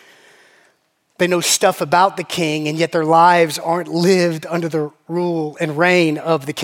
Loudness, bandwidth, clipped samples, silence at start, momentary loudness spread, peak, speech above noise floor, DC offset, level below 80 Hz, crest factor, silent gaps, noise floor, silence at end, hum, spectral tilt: -16 LUFS; 17 kHz; under 0.1%; 1.2 s; 10 LU; 0 dBFS; 46 dB; under 0.1%; -72 dBFS; 16 dB; none; -62 dBFS; 0 s; none; -4 dB/octave